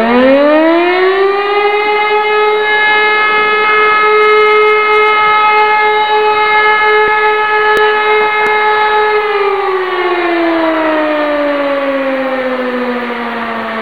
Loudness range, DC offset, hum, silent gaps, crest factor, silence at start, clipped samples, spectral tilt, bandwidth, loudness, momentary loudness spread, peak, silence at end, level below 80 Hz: 5 LU; 1%; none; none; 10 dB; 0 s; under 0.1%; -4.5 dB/octave; 7.2 kHz; -10 LUFS; 7 LU; 0 dBFS; 0 s; -50 dBFS